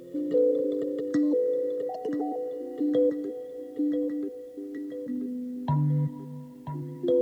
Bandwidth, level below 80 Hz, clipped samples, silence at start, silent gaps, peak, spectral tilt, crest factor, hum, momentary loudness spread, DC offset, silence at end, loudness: 8 kHz; -68 dBFS; under 0.1%; 0 s; none; -14 dBFS; -10 dB/octave; 14 dB; none; 13 LU; under 0.1%; 0 s; -29 LUFS